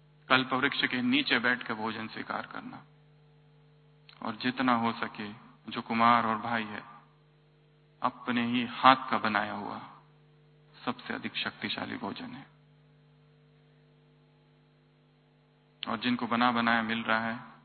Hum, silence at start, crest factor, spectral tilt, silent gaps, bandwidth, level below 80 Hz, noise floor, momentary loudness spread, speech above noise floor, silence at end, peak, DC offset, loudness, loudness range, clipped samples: 50 Hz at -65 dBFS; 0.3 s; 28 dB; -8.5 dB/octave; none; 4.6 kHz; -72 dBFS; -64 dBFS; 18 LU; 34 dB; 0.1 s; -4 dBFS; under 0.1%; -29 LUFS; 10 LU; under 0.1%